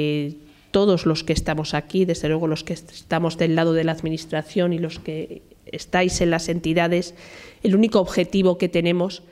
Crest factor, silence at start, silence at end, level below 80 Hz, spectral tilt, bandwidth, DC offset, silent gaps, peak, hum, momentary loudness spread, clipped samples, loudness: 18 dB; 0 s; 0.15 s; -44 dBFS; -6 dB/octave; 13.5 kHz; under 0.1%; none; -4 dBFS; none; 13 LU; under 0.1%; -22 LUFS